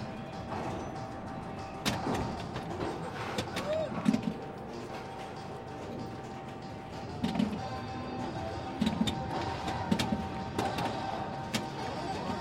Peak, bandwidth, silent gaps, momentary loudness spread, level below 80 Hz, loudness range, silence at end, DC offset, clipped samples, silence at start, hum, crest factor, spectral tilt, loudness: -12 dBFS; 16.5 kHz; none; 10 LU; -54 dBFS; 4 LU; 0 s; under 0.1%; under 0.1%; 0 s; none; 22 dB; -5.5 dB/octave; -36 LUFS